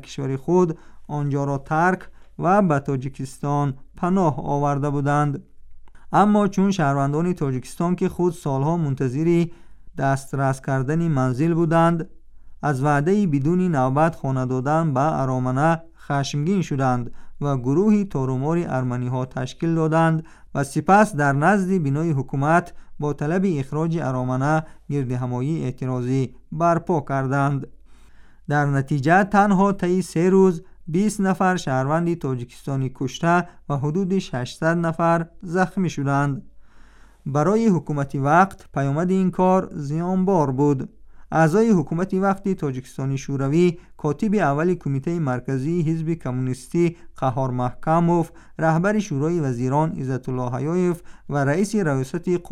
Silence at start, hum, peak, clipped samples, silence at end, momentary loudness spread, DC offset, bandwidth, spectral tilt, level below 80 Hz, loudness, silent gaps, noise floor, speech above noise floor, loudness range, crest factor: 0 s; none; -4 dBFS; under 0.1%; 0.05 s; 9 LU; under 0.1%; 13 kHz; -7.5 dB/octave; -46 dBFS; -22 LUFS; none; -46 dBFS; 25 dB; 3 LU; 16 dB